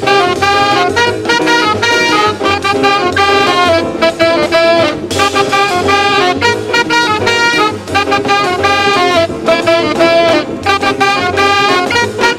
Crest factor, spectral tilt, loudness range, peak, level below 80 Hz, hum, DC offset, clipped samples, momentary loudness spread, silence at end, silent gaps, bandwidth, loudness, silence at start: 10 dB; -3.5 dB/octave; 1 LU; 0 dBFS; -44 dBFS; none; 0.2%; under 0.1%; 3 LU; 0 s; none; 16.5 kHz; -10 LUFS; 0 s